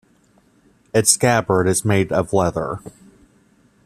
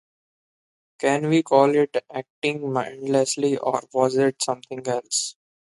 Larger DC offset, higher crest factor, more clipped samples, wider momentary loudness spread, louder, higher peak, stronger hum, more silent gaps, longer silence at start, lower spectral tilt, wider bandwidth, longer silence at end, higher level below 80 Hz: neither; about the same, 20 dB vs 20 dB; neither; about the same, 11 LU vs 10 LU; first, -18 LUFS vs -23 LUFS; first, 0 dBFS vs -4 dBFS; neither; second, none vs 2.30-2.42 s; about the same, 0.95 s vs 1 s; about the same, -4 dB/octave vs -4 dB/octave; first, 15 kHz vs 11.5 kHz; first, 0.95 s vs 0.45 s; first, -50 dBFS vs -72 dBFS